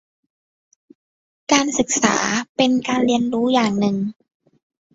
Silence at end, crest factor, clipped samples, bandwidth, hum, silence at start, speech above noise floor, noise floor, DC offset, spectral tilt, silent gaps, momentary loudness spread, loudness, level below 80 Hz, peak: 0.85 s; 20 dB; under 0.1%; 8 kHz; none; 1.5 s; over 71 dB; under -90 dBFS; under 0.1%; -3.5 dB/octave; 2.49-2.55 s; 5 LU; -19 LUFS; -58 dBFS; -2 dBFS